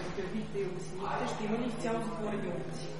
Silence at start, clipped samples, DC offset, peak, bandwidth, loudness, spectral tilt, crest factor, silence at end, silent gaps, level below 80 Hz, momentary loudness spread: 0 s; under 0.1%; 0.7%; -22 dBFS; 11.5 kHz; -36 LUFS; -6 dB/octave; 14 dB; 0 s; none; -56 dBFS; 4 LU